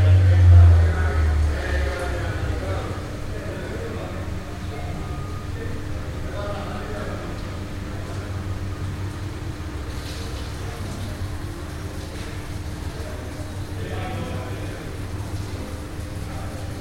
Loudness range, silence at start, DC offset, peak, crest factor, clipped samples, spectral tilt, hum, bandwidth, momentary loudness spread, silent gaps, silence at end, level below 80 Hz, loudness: 8 LU; 0 s; under 0.1%; -4 dBFS; 18 dB; under 0.1%; -6.5 dB/octave; none; 13 kHz; 11 LU; none; 0 s; -32 dBFS; -25 LUFS